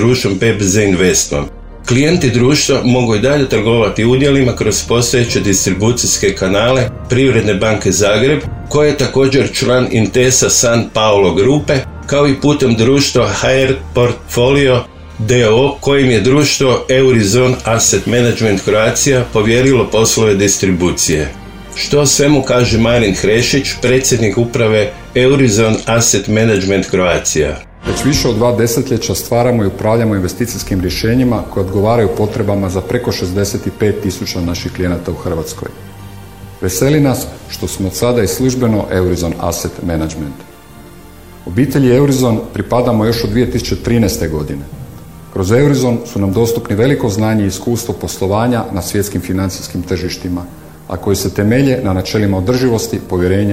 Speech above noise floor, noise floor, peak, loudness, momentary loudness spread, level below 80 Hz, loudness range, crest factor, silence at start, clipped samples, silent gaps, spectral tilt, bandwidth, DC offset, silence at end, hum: 24 dB; -36 dBFS; 0 dBFS; -12 LUFS; 9 LU; -32 dBFS; 6 LU; 12 dB; 0 s; under 0.1%; none; -4.5 dB/octave; 16.5 kHz; under 0.1%; 0 s; none